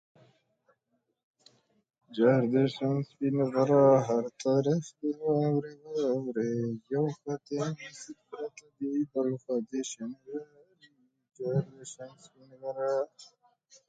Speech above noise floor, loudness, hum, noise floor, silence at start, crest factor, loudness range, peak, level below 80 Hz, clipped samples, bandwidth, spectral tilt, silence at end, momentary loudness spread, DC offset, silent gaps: 49 dB; -30 LUFS; none; -79 dBFS; 2.1 s; 20 dB; 10 LU; -12 dBFS; -76 dBFS; under 0.1%; 9.2 kHz; -7 dB/octave; 0.65 s; 17 LU; under 0.1%; none